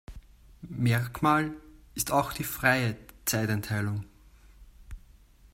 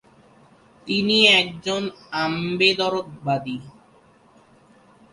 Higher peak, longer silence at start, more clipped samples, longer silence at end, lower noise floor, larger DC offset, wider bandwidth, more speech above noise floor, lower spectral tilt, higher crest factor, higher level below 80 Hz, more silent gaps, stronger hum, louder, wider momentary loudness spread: second, -8 dBFS vs -2 dBFS; second, 0.1 s vs 0.85 s; neither; second, 0.55 s vs 1.45 s; about the same, -56 dBFS vs -55 dBFS; neither; first, 16.5 kHz vs 11.5 kHz; second, 28 dB vs 33 dB; about the same, -5 dB/octave vs -4 dB/octave; about the same, 22 dB vs 22 dB; first, -52 dBFS vs -62 dBFS; neither; neither; second, -28 LUFS vs -20 LUFS; first, 18 LU vs 15 LU